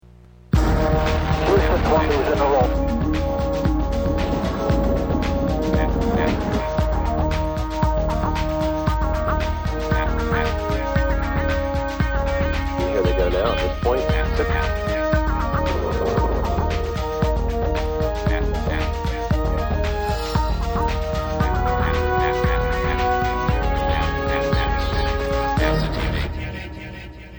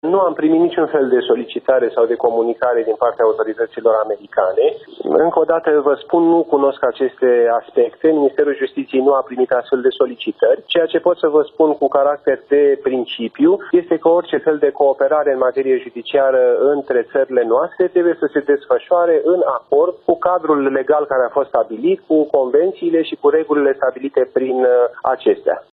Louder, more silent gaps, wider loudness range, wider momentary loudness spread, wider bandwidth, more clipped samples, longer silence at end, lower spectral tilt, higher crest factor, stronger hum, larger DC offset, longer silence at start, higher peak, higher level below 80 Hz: second, -22 LUFS vs -16 LUFS; neither; about the same, 3 LU vs 1 LU; about the same, 4 LU vs 4 LU; first, over 20 kHz vs 4.2 kHz; neither; about the same, 0 s vs 0.1 s; second, -7 dB/octave vs -9 dB/octave; about the same, 16 dB vs 14 dB; neither; neither; first, 0.55 s vs 0.05 s; second, -4 dBFS vs 0 dBFS; first, -24 dBFS vs -62 dBFS